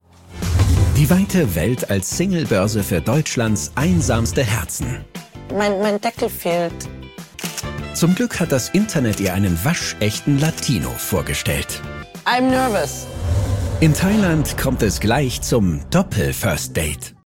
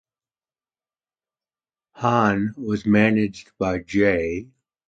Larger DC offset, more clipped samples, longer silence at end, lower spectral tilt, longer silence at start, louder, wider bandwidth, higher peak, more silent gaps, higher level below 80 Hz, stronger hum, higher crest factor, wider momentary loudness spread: neither; neither; second, 0.25 s vs 0.45 s; second, -5 dB/octave vs -7 dB/octave; second, 0.3 s vs 1.95 s; about the same, -19 LUFS vs -21 LUFS; first, 16.5 kHz vs 7.8 kHz; about the same, -2 dBFS vs -4 dBFS; neither; first, -32 dBFS vs -50 dBFS; neither; about the same, 18 dB vs 20 dB; about the same, 10 LU vs 10 LU